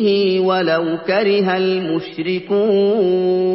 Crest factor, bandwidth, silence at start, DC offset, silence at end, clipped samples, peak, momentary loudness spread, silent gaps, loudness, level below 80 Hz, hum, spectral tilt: 12 dB; 5.8 kHz; 0 s; under 0.1%; 0 s; under 0.1%; -4 dBFS; 7 LU; none; -17 LUFS; -64 dBFS; none; -10.5 dB/octave